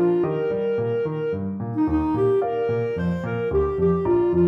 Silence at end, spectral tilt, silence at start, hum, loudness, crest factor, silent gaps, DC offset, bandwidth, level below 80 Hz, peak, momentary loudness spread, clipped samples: 0 s; -10.5 dB/octave; 0 s; none; -23 LUFS; 12 dB; none; under 0.1%; 5.6 kHz; -42 dBFS; -10 dBFS; 5 LU; under 0.1%